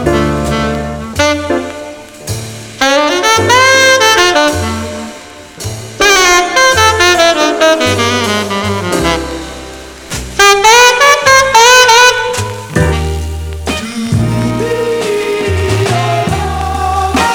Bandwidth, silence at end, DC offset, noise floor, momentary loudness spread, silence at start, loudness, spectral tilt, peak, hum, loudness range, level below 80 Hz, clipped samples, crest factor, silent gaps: over 20 kHz; 0 s; under 0.1%; -30 dBFS; 18 LU; 0 s; -9 LUFS; -3 dB/octave; 0 dBFS; none; 8 LU; -28 dBFS; 0.9%; 10 dB; none